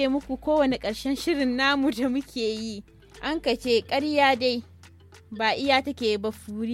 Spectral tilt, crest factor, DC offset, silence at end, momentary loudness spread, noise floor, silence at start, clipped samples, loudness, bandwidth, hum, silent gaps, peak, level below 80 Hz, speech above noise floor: -4 dB/octave; 18 dB; under 0.1%; 0 s; 12 LU; -50 dBFS; 0 s; under 0.1%; -25 LUFS; 15.5 kHz; none; none; -8 dBFS; -52 dBFS; 25 dB